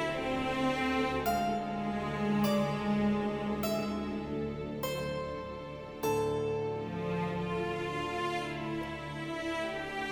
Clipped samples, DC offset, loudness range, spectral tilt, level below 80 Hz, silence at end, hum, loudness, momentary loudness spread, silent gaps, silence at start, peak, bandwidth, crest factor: under 0.1%; under 0.1%; 4 LU; -6 dB/octave; -54 dBFS; 0 s; none; -34 LUFS; 7 LU; none; 0 s; -18 dBFS; 19 kHz; 14 dB